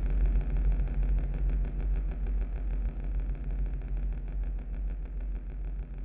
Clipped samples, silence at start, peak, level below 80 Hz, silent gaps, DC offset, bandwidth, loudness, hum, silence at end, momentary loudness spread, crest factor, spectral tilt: under 0.1%; 0 s; -18 dBFS; -30 dBFS; none; under 0.1%; 2.8 kHz; -35 LUFS; none; 0 s; 8 LU; 10 dB; -11.5 dB/octave